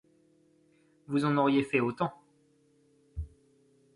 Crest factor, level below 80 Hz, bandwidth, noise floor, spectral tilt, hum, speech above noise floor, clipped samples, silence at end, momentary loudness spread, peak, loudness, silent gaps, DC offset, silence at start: 20 dB; -52 dBFS; 11 kHz; -67 dBFS; -7.5 dB/octave; none; 39 dB; under 0.1%; 0.7 s; 19 LU; -12 dBFS; -29 LUFS; none; under 0.1%; 1.1 s